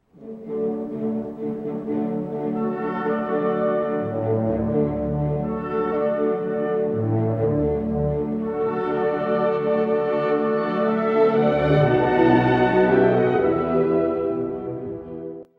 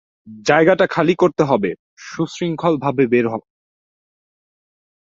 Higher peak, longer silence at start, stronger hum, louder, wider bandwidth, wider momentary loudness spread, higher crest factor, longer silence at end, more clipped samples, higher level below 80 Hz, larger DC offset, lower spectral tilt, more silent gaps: second, -6 dBFS vs -2 dBFS; about the same, 0.2 s vs 0.25 s; neither; second, -22 LUFS vs -17 LUFS; second, 5.6 kHz vs 7.6 kHz; about the same, 10 LU vs 11 LU; about the same, 16 dB vs 18 dB; second, 0.15 s vs 1.75 s; neither; first, -44 dBFS vs -58 dBFS; neither; first, -10 dB/octave vs -6.5 dB/octave; second, none vs 1.79-1.97 s